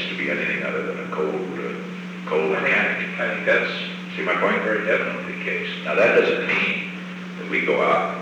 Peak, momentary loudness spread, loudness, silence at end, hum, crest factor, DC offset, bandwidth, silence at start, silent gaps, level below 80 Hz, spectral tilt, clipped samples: -6 dBFS; 11 LU; -22 LUFS; 0 s; none; 18 dB; under 0.1%; 9.8 kHz; 0 s; none; -70 dBFS; -5.5 dB/octave; under 0.1%